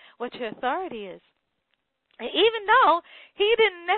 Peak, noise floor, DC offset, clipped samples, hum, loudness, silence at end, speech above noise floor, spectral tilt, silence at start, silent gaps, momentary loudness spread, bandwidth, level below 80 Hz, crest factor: -6 dBFS; -76 dBFS; under 0.1%; under 0.1%; none; -22 LUFS; 0 s; 52 dB; -7 dB/octave; 0.2 s; none; 18 LU; 4.5 kHz; -64 dBFS; 18 dB